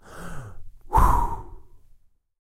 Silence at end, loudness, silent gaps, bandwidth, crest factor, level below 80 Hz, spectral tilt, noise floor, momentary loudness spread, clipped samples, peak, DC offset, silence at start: 0.65 s; -23 LUFS; none; 16 kHz; 22 dB; -28 dBFS; -6.5 dB/octave; -55 dBFS; 21 LU; under 0.1%; -4 dBFS; under 0.1%; 0.1 s